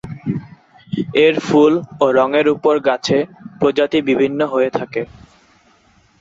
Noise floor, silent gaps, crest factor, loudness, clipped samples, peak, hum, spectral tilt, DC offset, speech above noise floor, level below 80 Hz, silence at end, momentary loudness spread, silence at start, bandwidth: -53 dBFS; none; 16 dB; -16 LUFS; under 0.1%; -2 dBFS; none; -6 dB/octave; under 0.1%; 39 dB; -54 dBFS; 1.15 s; 12 LU; 0.05 s; 7.8 kHz